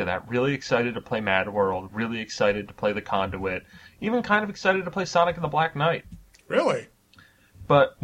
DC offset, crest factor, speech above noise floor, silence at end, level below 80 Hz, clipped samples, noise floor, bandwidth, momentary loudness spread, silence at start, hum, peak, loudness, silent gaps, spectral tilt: under 0.1%; 20 dB; 31 dB; 0 s; -54 dBFS; under 0.1%; -56 dBFS; 10.5 kHz; 7 LU; 0 s; none; -6 dBFS; -25 LUFS; none; -5.5 dB/octave